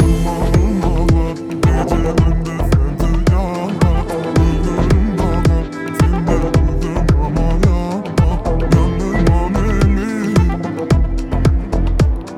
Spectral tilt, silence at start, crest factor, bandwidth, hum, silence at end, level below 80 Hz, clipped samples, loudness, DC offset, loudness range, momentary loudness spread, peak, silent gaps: -7.5 dB/octave; 0 s; 14 dB; 13 kHz; none; 0 s; -18 dBFS; under 0.1%; -16 LUFS; under 0.1%; 1 LU; 4 LU; 0 dBFS; none